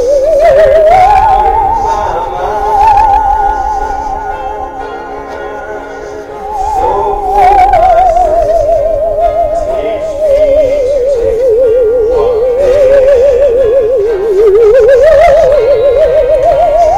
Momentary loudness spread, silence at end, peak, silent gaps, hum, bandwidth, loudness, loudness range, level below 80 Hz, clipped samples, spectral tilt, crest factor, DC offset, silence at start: 15 LU; 0 s; 0 dBFS; none; none; 14.5 kHz; -8 LUFS; 8 LU; -24 dBFS; 0.6%; -5.5 dB/octave; 8 dB; under 0.1%; 0 s